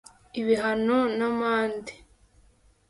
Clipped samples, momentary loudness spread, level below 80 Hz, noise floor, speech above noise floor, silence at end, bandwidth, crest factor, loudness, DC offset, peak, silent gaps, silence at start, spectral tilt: under 0.1%; 14 LU; -60 dBFS; -60 dBFS; 35 dB; 0.95 s; 11.5 kHz; 16 dB; -25 LUFS; under 0.1%; -12 dBFS; none; 0.35 s; -5.5 dB/octave